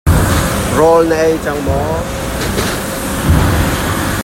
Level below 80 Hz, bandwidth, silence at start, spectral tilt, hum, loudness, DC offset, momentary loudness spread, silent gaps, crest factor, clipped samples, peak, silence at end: -22 dBFS; 16.5 kHz; 0.05 s; -5 dB/octave; none; -14 LUFS; under 0.1%; 8 LU; none; 12 dB; under 0.1%; 0 dBFS; 0 s